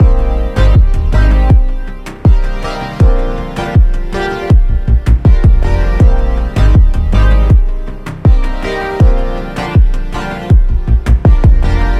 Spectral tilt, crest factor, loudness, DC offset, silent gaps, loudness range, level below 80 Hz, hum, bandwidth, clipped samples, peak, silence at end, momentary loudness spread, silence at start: -8 dB/octave; 8 dB; -12 LUFS; under 0.1%; none; 3 LU; -10 dBFS; none; 7.4 kHz; 0.1%; 0 dBFS; 0 s; 10 LU; 0 s